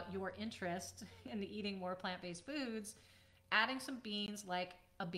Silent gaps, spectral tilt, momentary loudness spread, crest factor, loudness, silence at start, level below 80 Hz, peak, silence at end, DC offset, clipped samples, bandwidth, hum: none; -3.5 dB/octave; 13 LU; 26 dB; -42 LUFS; 0 s; -76 dBFS; -18 dBFS; 0 s; under 0.1%; under 0.1%; 16 kHz; none